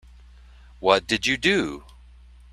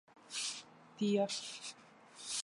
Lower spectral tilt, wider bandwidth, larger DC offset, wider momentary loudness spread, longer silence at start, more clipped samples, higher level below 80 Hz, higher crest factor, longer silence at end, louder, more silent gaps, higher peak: about the same, -3.5 dB/octave vs -3.5 dB/octave; first, 14 kHz vs 11.5 kHz; neither; second, 11 LU vs 23 LU; first, 0.8 s vs 0.15 s; neither; first, -48 dBFS vs -86 dBFS; first, 24 dB vs 18 dB; first, 0.7 s vs 0 s; first, -22 LUFS vs -39 LUFS; neither; first, -2 dBFS vs -22 dBFS